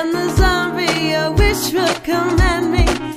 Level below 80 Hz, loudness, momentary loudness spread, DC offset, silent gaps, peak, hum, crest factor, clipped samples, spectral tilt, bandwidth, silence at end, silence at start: -22 dBFS; -16 LUFS; 2 LU; under 0.1%; none; 0 dBFS; none; 16 dB; under 0.1%; -5 dB/octave; 15.5 kHz; 0 s; 0 s